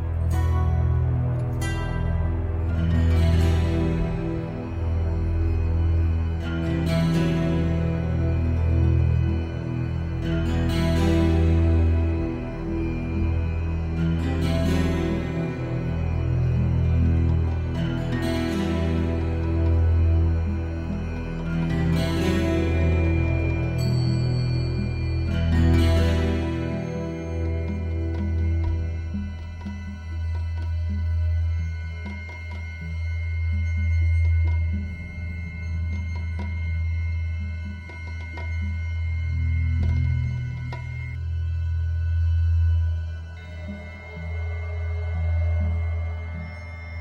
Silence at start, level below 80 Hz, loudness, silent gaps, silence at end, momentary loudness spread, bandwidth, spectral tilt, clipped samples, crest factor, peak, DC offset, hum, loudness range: 0 s; -28 dBFS; -25 LUFS; none; 0 s; 11 LU; 8.4 kHz; -8 dB/octave; under 0.1%; 14 dB; -10 dBFS; under 0.1%; none; 6 LU